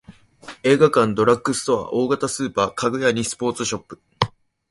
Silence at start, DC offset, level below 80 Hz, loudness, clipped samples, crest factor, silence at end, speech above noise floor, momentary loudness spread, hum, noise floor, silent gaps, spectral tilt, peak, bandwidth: 0.1 s; under 0.1%; -52 dBFS; -20 LUFS; under 0.1%; 20 dB; 0.4 s; 23 dB; 9 LU; none; -43 dBFS; none; -4.5 dB/octave; 0 dBFS; 11.5 kHz